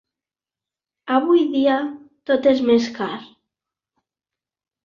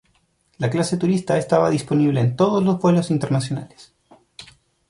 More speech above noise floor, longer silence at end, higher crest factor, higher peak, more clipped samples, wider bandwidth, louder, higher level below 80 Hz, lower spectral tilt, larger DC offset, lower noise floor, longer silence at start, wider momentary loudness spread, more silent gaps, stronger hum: first, 72 dB vs 45 dB; first, 1.6 s vs 0.45 s; about the same, 18 dB vs 16 dB; about the same, -4 dBFS vs -4 dBFS; neither; second, 7.2 kHz vs 11.5 kHz; about the same, -19 LUFS vs -20 LUFS; second, -64 dBFS vs -58 dBFS; second, -5.5 dB/octave vs -7 dB/octave; neither; first, -90 dBFS vs -64 dBFS; first, 1.05 s vs 0.6 s; first, 17 LU vs 6 LU; neither; neither